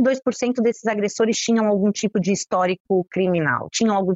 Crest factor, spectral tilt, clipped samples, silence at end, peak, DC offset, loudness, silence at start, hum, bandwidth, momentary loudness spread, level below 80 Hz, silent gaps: 12 dB; -5 dB/octave; under 0.1%; 0 s; -8 dBFS; under 0.1%; -21 LUFS; 0 s; none; 8.2 kHz; 4 LU; -60 dBFS; 2.80-2.85 s